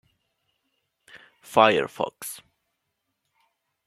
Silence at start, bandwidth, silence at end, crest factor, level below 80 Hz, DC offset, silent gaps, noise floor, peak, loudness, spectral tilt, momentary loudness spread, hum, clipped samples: 1.5 s; 15.5 kHz; 1.5 s; 26 dB; -72 dBFS; under 0.1%; none; -79 dBFS; -2 dBFS; -22 LUFS; -3.5 dB/octave; 18 LU; none; under 0.1%